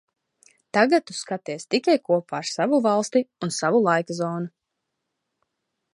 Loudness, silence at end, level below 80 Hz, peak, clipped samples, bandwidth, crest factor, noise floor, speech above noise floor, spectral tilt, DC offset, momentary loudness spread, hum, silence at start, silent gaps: -23 LUFS; 1.45 s; -76 dBFS; -4 dBFS; under 0.1%; 11.5 kHz; 20 dB; -80 dBFS; 58 dB; -4.5 dB/octave; under 0.1%; 11 LU; none; 0.75 s; none